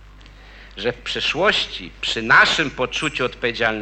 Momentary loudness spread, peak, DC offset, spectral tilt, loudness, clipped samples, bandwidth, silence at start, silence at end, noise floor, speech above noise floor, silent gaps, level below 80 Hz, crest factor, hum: 13 LU; -2 dBFS; under 0.1%; -3 dB/octave; -19 LUFS; under 0.1%; 9.6 kHz; 0 s; 0 s; -43 dBFS; 23 dB; none; -44 dBFS; 18 dB; none